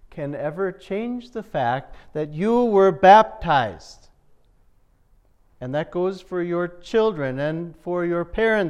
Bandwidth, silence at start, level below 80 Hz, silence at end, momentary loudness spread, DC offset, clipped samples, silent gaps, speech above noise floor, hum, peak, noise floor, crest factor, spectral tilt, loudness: 9.8 kHz; 0.15 s; -48 dBFS; 0 s; 15 LU; under 0.1%; under 0.1%; none; 37 dB; none; -2 dBFS; -58 dBFS; 20 dB; -7 dB/octave; -21 LUFS